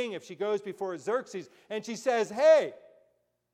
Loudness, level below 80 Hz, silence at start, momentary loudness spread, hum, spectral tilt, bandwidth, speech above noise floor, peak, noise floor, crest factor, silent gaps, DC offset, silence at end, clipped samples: -29 LUFS; -84 dBFS; 0 s; 17 LU; none; -4 dB/octave; 11.5 kHz; 44 dB; -12 dBFS; -73 dBFS; 18 dB; none; under 0.1%; 0.8 s; under 0.1%